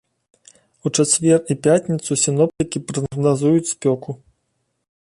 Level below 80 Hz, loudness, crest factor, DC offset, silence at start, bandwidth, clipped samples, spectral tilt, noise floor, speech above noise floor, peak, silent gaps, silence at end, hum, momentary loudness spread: -56 dBFS; -18 LUFS; 16 dB; under 0.1%; 0.85 s; 11.5 kHz; under 0.1%; -5 dB/octave; -71 dBFS; 53 dB; -2 dBFS; none; 0.95 s; none; 10 LU